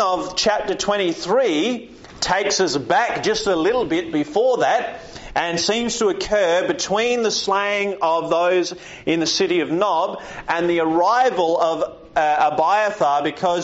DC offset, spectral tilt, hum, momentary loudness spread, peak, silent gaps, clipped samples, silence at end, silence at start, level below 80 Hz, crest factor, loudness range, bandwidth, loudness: under 0.1%; -2 dB/octave; none; 6 LU; -6 dBFS; none; under 0.1%; 0 s; 0 s; -50 dBFS; 14 dB; 1 LU; 8 kHz; -19 LUFS